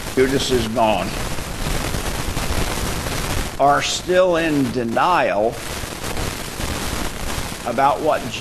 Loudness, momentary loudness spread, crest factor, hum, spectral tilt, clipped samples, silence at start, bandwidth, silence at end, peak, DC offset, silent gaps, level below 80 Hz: -20 LUFS; 10 LU; 16 dB; none; -4 dB/octave; under 0.1%; 0 s; 13 kHz; 0 s; -4 dBFS; under 0.1%; none; -30 dBFS